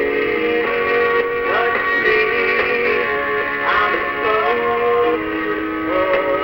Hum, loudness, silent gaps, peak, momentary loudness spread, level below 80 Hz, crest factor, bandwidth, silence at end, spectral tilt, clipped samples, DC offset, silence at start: none; -17 LUFS; none; -4 dBFS; 4 LU; -48 dBFS; 14 dB; 16.5 kHz; 0 s; -6 dB/octave; under 0.1%; 0.2%; 0 s